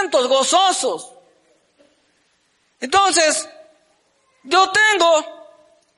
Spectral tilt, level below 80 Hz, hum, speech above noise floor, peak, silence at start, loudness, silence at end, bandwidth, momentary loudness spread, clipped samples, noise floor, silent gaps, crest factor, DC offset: 0 dB/octave; -64 dBFS; none; 47 dB; -6 dBFS; 0 s; -16 LUFS; 0.65 s; 11.5 kHz; 17 LU; under 0.1%; -63 dBFS; none; 14 dB; under 0.1%